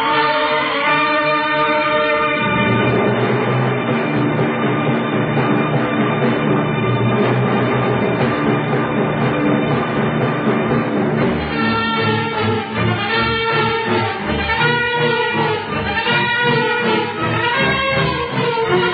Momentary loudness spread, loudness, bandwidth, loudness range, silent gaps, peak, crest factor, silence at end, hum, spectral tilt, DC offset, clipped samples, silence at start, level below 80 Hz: 3 LU; -16 LUFS; 5 kHz; 2 LU; none; -4 dBFS; 14 dB; 0 s; none; -10 dB/octave; under 0.1%; under 0.1%; 0 s; -44 dBFS